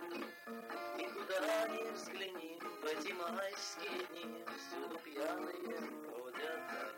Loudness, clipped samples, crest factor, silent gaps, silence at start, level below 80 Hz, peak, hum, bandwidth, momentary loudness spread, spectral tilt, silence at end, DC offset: -43 LUFS; under 0.1%; 16 dB; none; 0 s; under -90 dBFS; -26 dBFS; none; 16.5 kHz; 9 LU; -2 dB/octave; 0 s; under 0.1%